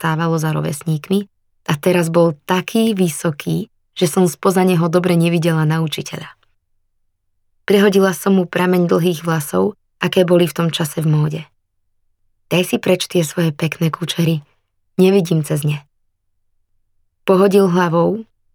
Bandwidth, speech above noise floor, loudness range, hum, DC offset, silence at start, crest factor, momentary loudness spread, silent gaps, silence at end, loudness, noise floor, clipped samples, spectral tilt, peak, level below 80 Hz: 19 kHz; 50 dB; 3 LU; none; under 0.1%; 0 s; 16 dB; 10 LU; none; 0.3 s; -16 LUFS; -65 dBFS; under 0.1%; -6 dB/octave; -2 dBFS; -62 dBFS